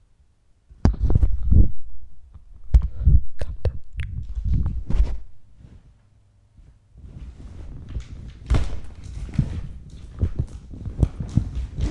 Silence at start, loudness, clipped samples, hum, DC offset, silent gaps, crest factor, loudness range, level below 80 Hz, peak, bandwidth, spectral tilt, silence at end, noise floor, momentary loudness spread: 0.85 s; -25 LUFS; under 0.1%; none; under 0.1%; none; 20 dB; 11 LU; -26 dBFS; 0 dBFS; 8.2 kHz; -8.5 dB/octave; 0 s; -58 dBFS; 20 LU